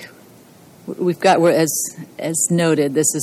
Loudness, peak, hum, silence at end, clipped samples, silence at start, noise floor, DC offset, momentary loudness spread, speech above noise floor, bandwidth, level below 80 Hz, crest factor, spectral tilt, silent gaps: -17 LUFS; -2 dBFS; none; 0 s; under 0.1%; 0 s; -45 dBFS; under 0.1%; 13 LU; 28 dB; 16.5 kHz; -68 dBFS; 16 dB; -4 dB/octave; none